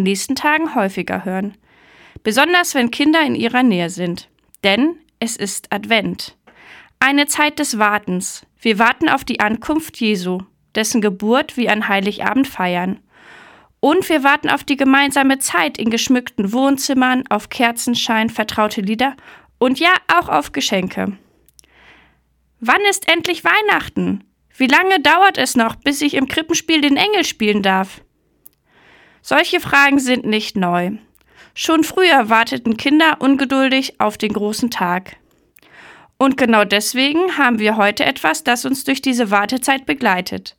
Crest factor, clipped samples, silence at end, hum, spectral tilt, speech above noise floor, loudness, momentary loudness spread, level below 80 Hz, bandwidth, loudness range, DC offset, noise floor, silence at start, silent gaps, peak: 16 dB; under 0.1%; 0.1 s; none; -3.5 dB/octave; 44 dB; -16 LUFS; 10 LU; -54 dBFS; 19 kHz; 4 LU; under 0.1%; -60 dBFS; 0 s; none; 0 dBFS